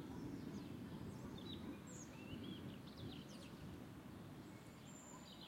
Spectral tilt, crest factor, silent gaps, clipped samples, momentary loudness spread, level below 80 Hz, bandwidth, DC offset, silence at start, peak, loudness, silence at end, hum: -5.5 dB/octave; 16 dB; none; under 0.1%; 5 LU; -70 dBFS; 16 kHz; under 0.1%; 0 s; -38 dBFS; -54 LUFS; 0 s; none